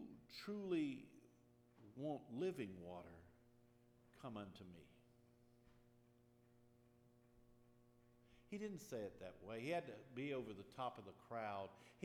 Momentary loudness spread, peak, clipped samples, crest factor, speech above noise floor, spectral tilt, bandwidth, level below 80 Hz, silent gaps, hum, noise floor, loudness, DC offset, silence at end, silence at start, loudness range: 17 LU; -32 dBFS; under 0.1%; 20 dB; 24 dB; -6 dB/octave; 15 kHz; -82 dBFS; none; none; -73 dBFS; -50 LUFS; under 0.1%; 0 s; 0 s; 12 LU